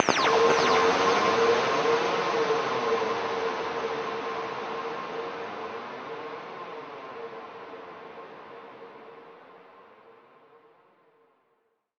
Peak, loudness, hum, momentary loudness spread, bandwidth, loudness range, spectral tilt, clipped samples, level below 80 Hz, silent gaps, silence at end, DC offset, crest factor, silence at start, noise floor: -4 dBFS; -26 LUFS; none; 23 LU; 8.2 kHz; 22 LU; -3 dB/octave; under 0.1%; -68 dBFS; none; 1.9 s; under 0.1%; 26 dB; 0 s; -72 dBFS